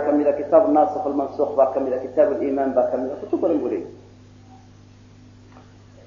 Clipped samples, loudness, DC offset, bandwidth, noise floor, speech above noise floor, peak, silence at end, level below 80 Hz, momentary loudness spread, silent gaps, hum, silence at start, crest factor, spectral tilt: under 0.1%; -21 LUFS; under 0.1%; 7 kHz; -47 dBFS; 27 dB; -2 dBFS; 0.45 s; -58 dBFS; 9 LU; none; 50 Hz at -50 dBFS; 0 s; 18 dB; -8.5 dB/octave